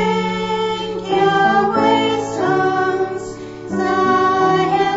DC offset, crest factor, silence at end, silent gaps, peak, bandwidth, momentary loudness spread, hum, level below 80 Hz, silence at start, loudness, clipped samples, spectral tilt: under 0.1%; 14 dB; 0 s; none; -4 dBFS; 8 kHz; 9 LU; none; -48 dBFS; 0 s; -17 LUFS; under 0.1%; -5.5 dB/octave